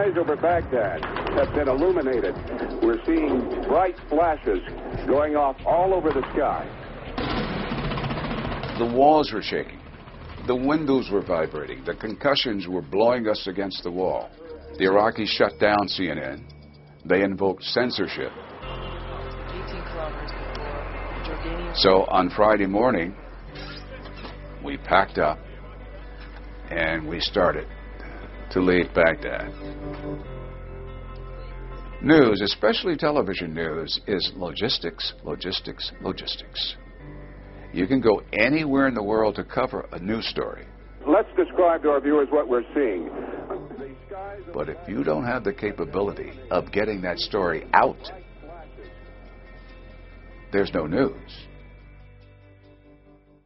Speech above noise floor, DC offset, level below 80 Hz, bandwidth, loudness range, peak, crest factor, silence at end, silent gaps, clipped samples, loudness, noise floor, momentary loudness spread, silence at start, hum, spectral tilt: 31 dB; under 0.1%; -42 dBFS; 6 kHz; 6 LU; 0 dBFS; 24 dB; 1.35 s; none; under 0.1%; -24 LUFS; -54 dBFS; 19 LU; 0 s; none; -3.5 dB/octave